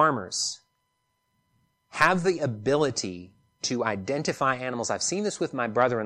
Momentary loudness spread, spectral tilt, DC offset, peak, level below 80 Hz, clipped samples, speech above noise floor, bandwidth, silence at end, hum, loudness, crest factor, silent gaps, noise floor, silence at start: 10 LU; -3.5 dB/octave; under 0.1%; -6 dBFS; -64 dBFS; under 0.1%; 49 dB; 14.5 kHz; 0 s; none; -26 LUFS; 22 dB; none; -75 dBFS; 0 s